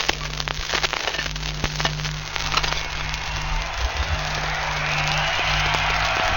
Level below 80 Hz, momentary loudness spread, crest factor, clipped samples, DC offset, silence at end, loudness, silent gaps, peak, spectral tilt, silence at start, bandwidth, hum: -32 dBFS; 6 LU; 22 dB; under 0.1%; under 0.1%; 0 s; -23 LUFS; none; -2 dBFS; -2.5 dB/octave; 0 s; 17 kHz; none